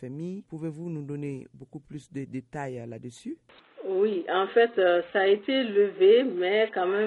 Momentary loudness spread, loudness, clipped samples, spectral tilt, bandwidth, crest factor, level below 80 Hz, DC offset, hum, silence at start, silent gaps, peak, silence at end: 20 LU; -25 LUFS; under 0.1%; -6.5 dB/octave; 11 kHz; 16 dB; -72 dBFS; under 0.1%; none; 0 s; none; -10 dBFS; 0 s